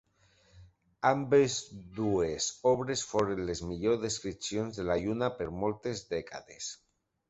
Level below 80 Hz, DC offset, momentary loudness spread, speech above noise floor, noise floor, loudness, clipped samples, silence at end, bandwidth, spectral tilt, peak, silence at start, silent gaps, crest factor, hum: -56 dBFS; under 0.1%; 14 LU; 35 dB; -66 dBFS; -32 LUFS; under 0.1%; 0.55 s; 8.2 kHz; -4.5 dB/octave; -12 dBFS; 0.55 s; none; 20 dB; none